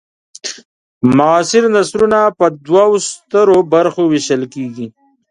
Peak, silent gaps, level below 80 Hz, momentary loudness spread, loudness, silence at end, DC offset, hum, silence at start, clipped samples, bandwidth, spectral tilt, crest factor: 0 dBFS; 0.65-1.01 s; -54 dBFS; 15 LU; -12 LUFS; 0.4 s; under 0.1%; none; 0.45 s; under 0.1%; 11 kHz; -5 dB/octave; 12 dB